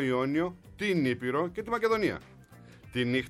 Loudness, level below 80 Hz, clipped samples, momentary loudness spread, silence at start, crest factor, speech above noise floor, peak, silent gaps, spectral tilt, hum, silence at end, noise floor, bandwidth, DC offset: -30 LUFS; -60 dBFS; under 0.1%; 7 LU; 0 s; 16 dB; 23 dB; -16 dBFS; none; -6.5 dB/octave; none; 0 s; -53 dBFS; 13.5 kHz; under 0.1%